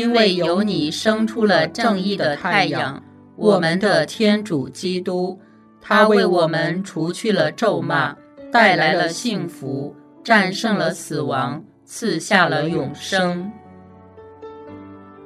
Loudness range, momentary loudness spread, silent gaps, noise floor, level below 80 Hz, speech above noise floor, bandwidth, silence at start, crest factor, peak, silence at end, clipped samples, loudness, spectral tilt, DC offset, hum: 3 LU; 14 LU; none; -43 dBFS; -66 dBFS; 25 dB; 13.5 kHz; 0 s; 20 dB; 0 dBFS; 0 s; under 0.1%; -19 LUFS; -5 dB/octave; under 0.1%; none